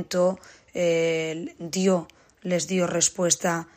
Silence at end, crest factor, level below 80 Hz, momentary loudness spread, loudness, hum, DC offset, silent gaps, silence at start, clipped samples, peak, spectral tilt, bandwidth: 0.15 s; 20 dB; -66 dBFS; 12 LU; -24 LUFS; none; under 0.1%; none; 0 s; under 0.1%; -6 dBFS; -3.5 dB/octave; 15.5 kHz